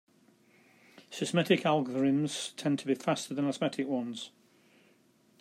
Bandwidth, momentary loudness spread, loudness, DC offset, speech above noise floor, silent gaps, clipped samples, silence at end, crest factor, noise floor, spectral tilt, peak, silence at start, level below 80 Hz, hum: 14 kHz; 12 LU; -31 LUFS; under 0.1%; 35 dB; none; under 0.1%; 1.1 s; 20 dB; -66 dBFS; -5 dB/octave; -14 dBFS; 1.1 s; -80 dBFS; none